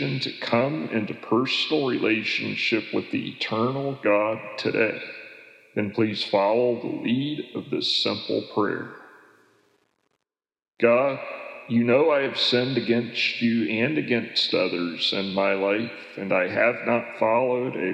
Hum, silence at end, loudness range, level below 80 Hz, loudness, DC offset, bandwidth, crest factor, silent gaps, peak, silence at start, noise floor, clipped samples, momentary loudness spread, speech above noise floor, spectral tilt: none; 0 s; 5 LU; -82 dBFS; -24 LUFS; under 0.1%; 10 kHz; 20 dB; none; -6 dBFS; 0 s; -80 dBFS; under 0.1%; 9 LU; 56 dB; -5.5 dB/octave